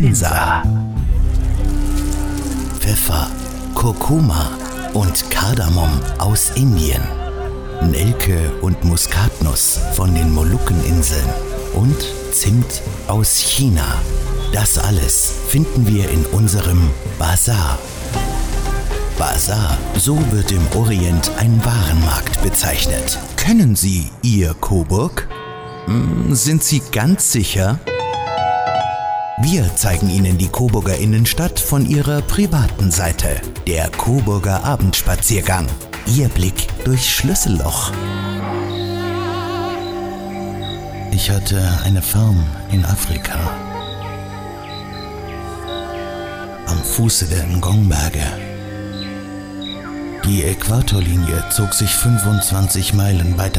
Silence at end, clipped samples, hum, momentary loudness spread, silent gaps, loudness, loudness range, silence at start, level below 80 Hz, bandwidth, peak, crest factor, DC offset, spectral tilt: 0 s; under 0.1%; none; 12 LU; none; -17 LUFS; 5 LU; 0 s; -22 dBFS; over 20 kHz; -4 dBFS; 12 dB; under 0.1%; -4.5 dB/octave